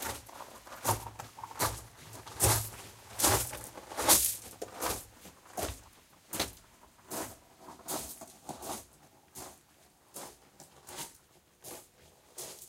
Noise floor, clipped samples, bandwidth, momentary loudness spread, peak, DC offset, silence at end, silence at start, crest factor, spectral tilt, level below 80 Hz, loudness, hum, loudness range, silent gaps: -63 dBFS; under 0.1%; 16.5 kHz; 22 LU; -10 dBFS; under 0.1%; 0 s; 0 s; 28 dB; -2 dB/octave; -54 dBFS; -32 LUFS; none; 18 LU; none